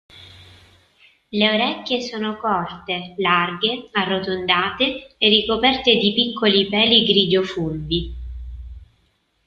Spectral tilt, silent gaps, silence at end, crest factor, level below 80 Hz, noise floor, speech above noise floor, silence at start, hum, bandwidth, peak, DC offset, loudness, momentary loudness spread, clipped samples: -5.5 dB/octave; none; 0.65 s; 20 dB; -42 dBFS; -64 dBFS; 45 dB; 0.15 s; none; 7.2 kHz; -2 dBFS; under 0.1%; -18 LUFS; 12 LU; under 0.1%